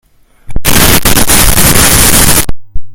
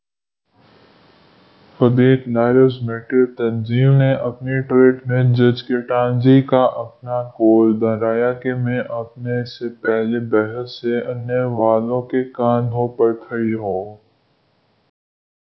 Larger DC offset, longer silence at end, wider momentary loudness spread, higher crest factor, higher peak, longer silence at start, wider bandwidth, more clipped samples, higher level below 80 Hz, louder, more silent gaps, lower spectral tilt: neither; second, 0 s vs 1.55 s; about the same, 10 LU vs 11 LU; second, 6 dB vs 18 dB; about the same, 0 dBFS vs 0 dBFS; second, 0.5 s vs 1.8 s; first, over 20 kHz vs 5.8 kHz; first, 7% vs under 0.1%; first, -16 dBFS vs -58 dBFS; first, -5 LUFS vs -17 LUFS; neither; second, -2.5 dB/octave vs -10.5 dB/octave